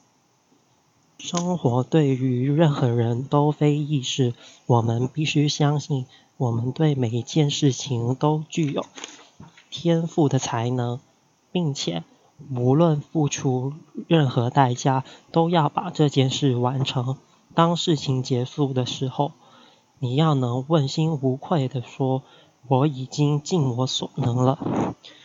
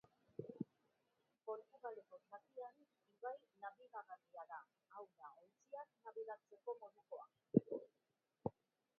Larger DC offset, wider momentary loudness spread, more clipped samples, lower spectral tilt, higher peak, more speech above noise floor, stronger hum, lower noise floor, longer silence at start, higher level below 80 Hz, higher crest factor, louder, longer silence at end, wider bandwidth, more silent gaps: neither; about the same, 9 LU vs 11 LU; neither; second, -6 dB/octave vs -9.5 dB/octave; first, -2 dBFS vs -18 dBFS; first, 41 dB vs 36 dB; neither; second, -63 dBFS vs -86 dBFS; first, 1.2 s vs 0.4 s; first, -66 dBFS vs -86 dBFS; second, 20 dB vs 32 dB; first, -23 LUFS vs -51 LUFS; second, 0.15 s vs 0.5 s; first, 7.8 kHz vs 4.6 kHz; neither